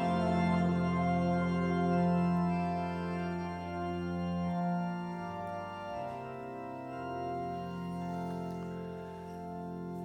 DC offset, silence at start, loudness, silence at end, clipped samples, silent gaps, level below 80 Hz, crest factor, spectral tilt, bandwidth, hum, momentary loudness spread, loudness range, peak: under 0.1%; 0 s; -35 LUFS; 0 s; under 0.1%; none; -58 dBFS; 14 dB; -8.5 dB/octave; 8.8 kHz; none; 12 LU; 9 LU; -18 dBFS